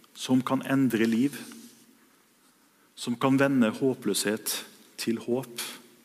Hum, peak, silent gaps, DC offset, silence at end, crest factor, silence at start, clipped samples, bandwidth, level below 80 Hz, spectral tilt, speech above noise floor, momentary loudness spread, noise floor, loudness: none; -10 dBFS; none; under 0.1%; 0.25 s; 20 dB; 0.15 s; under 0.1%; 15.5 kHz; -78 dBFS; -4.5 dB/octave; 36 dB; 14 LU; -62 dBFS; -27 LUFS